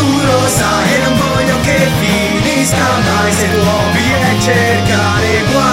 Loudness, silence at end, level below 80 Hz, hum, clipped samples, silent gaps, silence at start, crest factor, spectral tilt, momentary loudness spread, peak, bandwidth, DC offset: -11 LUFS; 0 s; -30 dBFS; none; under 0.1%; none; 0 s; 10 dB; -4.5 dB/octave; 1 LU; 0 dBFS; 16.5 kHz; under 0.1%